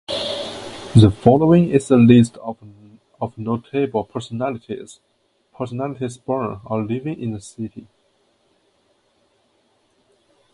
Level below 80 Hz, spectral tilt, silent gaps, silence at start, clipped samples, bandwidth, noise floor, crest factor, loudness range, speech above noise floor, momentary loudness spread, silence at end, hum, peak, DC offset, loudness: -46 dBFS; -7.5 dB/octave; none; 0.1 s; under 0.1%; 11.5 kHz; -63 dBFS; 20 dB; 15 LU; 45 dB; 20 LU; 2.75 s; none; 0 dBFS; under 0.1%; -18 LUFS